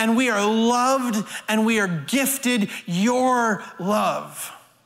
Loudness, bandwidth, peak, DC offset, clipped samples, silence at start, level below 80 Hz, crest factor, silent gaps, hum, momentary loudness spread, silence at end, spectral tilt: -21 LUFS; 16 kHz; -10 dBFS; under 0.1%; under 0.1%; 0 s; -68 dBFS; 12 dB; none; none; 8 LU; 0.3 s; -4 dB/octave